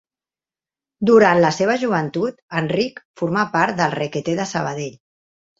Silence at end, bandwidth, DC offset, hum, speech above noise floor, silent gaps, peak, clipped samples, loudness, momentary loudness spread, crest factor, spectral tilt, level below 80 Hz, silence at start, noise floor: 0.65 s; 7.8 kHz; under 0.1%; none; over 71 dB; 2.42-2.48 s, 3.05-3.14 s; -2 dBFS; under 0.1%; -19 LUFS; 12 LU; 18 dB; -5.5 dB/octave; -60 dBFS; 1 s; under -90 dBFS